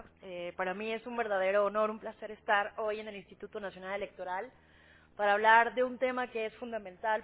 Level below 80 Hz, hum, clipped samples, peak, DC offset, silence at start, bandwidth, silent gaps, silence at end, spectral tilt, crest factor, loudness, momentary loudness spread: -70 dBFS; none; under 0.1%; -10 dBFS; under 0.1%; 0 s; 4 kHz; none; 0 s; -1.5 dB/octave; 22 dB; -32 LUFS; 17 LU